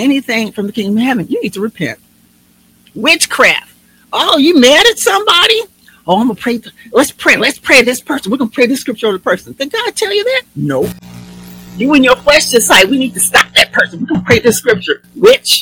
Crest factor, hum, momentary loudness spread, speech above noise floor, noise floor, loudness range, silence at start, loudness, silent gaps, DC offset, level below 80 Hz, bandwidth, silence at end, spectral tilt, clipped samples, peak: 12 dB; none; 12 LU; 38 dB; -49 dBFS; 6 LU; 0 s; -10 LUFS; none; under 0.1%; -44 dBFS; over 20 kHz; 0 s; -2.5 dB/octave; 2%; 0 dBFS